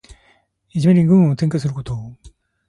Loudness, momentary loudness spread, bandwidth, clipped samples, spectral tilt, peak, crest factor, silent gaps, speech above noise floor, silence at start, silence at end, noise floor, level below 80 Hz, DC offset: -16 LUFS; 17 LU; 11 kHz; under 0.1%; -8.5 dB/octave; -4 dBFS; 14 dB; none; 42 dB; 0.1 s; 0.4 s; -58 dBFS; -48 dBFS; under 0.1%